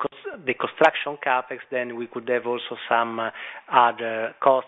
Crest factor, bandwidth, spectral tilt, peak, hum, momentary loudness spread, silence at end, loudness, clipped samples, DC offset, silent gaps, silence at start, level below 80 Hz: 22 dB; 8 kHz; -5.5 dB/octave; -2 dBFS; none; 11 LU; 0 s; -24 LUFS; under 0.1%; under 0.1%; none; 0 s; -72 dBFS